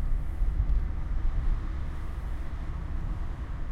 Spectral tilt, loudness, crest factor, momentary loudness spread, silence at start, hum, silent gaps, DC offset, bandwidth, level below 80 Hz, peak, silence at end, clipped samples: -8 dB/octave; -35 LUFS; 14 dB; 7 LU; 0 s; none; none; under 0.1%; 4.4 kHz; -30 dBFS; -14 dBFS; 0 s; under 0.1%